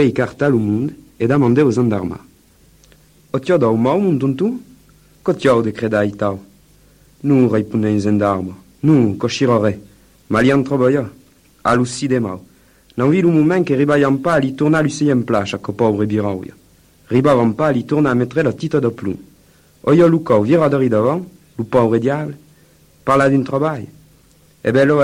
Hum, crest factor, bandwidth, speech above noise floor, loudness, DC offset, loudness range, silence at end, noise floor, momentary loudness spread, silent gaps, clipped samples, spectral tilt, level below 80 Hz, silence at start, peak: none; 14 dB; 13 kHz; 36 dB; -16 LUFS; under 0.1%; 3 LU; 0 s; -51 dBFS; 12 LU; none; under 0.1%; -7.5 dB/octave; -50 dBFS; 0 s; -2 dBFS